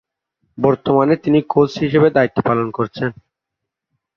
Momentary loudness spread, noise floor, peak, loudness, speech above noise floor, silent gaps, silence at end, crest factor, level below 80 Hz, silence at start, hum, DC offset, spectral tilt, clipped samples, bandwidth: 8 LU; -81 dBFS; -2 dBFS; -16 LUFS; 66 dB; none; 1.05 s; 16 dB; -52 dBFS; 0.6 s; none; under 0.1%; -8 dB/octave; under 0.1%; 6.8 kHz